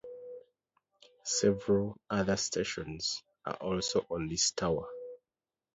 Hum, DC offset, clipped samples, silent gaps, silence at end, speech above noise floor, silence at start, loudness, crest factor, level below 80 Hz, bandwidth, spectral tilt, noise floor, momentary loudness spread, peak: none; under 0.1%; under 0.1%; none; 0.6 s; over 58 dB; 0.05 s; -32 LUFS; 18 dB; -58 dBFS; 8.2 kHz; -3.5 dB/octave; under -90 dBFS; 18 LU; -16 dBFS